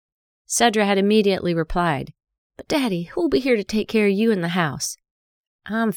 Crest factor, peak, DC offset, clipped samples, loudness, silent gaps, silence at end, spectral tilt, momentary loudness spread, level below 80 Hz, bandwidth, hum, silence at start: 20 dB; -2 dBFS; under 0.1%; under 0.1%; -21 LUFS; 2.38-2.50 s, 5.11-5.59 s; 0 s; -4.5 dB/octave; 11 LU; -44 dBFS; 18.5 kHz; none; 0.5 s